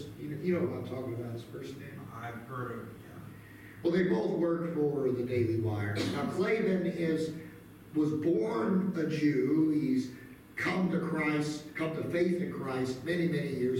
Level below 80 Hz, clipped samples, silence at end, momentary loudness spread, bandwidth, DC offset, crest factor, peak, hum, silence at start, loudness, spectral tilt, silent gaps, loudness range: -64 dBFS; under 0.1%; 0 s; 15 LU; 17 kHz; under 0.1%; 14 dB; -18 dBFS; none; 0 s; -32 LUFS; -7 dB/octave; none; 7 LU